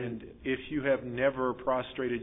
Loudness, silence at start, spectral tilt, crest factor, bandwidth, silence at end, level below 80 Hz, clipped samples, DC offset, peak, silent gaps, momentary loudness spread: -32 LUFS; 0 s; -10 dB/octave; 18 dB; 3.9 kHz; 0 s; -56 dBFS; under 0.1%; under 0.1%; -14 dBFS; none; 7 LU